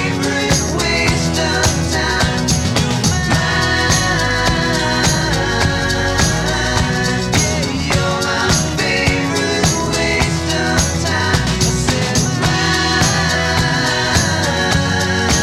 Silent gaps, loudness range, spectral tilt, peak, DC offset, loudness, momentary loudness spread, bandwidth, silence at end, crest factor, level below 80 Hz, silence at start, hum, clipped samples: none; 1 LU; -3.5 dB/octave; 0 dBFS; under 0.1%; -15 LUFS; 2 LU; 16.5 kHz; 0 s; 16 dB; -28 dBFS; 0 s; none; under 0.1%